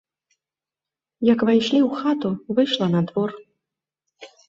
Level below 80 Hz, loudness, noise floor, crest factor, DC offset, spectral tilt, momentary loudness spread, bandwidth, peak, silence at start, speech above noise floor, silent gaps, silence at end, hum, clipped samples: -64 dBFS; -21 LUFS; -89 dBFS; 18 dB; under 0.1%; -7 dB/octave; 7 LU; 7.6 kHz; -6 dBFS; 1.2 s; 70 dB; none; 0.25 s; none; under 0.1%